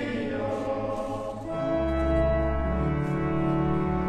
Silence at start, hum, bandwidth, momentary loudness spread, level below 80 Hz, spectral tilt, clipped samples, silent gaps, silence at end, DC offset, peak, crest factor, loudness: 0 s; none; 9.2 kHz; 7 LU; -34 dBFS; -8.5 dB/octave; under 0.1%; none; 0 s; under 0.1%; -14 dBFS; 12 dB; -28 LUFS